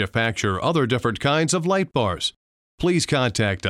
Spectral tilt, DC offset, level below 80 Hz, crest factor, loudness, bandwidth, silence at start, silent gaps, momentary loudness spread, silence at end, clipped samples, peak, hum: -4.5 dB/octave; under 0.1%; -48 dBFS; 14 dB; -22 LUFS; 14.5 kHz; 0 s; 2.36-2.78 s; 4 LU; 0 s; under 0.1%; -8 dBFS; none